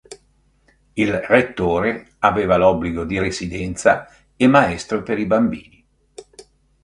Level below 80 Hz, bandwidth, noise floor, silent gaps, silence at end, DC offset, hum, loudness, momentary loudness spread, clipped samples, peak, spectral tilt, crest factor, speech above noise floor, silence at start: -42 dBFS; 11 kHz; -59 dBFS; none; 0.4 s; under 0.1%; none; -18 LUFS; 9 LU; under 0.1%; 0 dBFS; -6 dB/octave; 20 dB; 41 dB; 0.1 s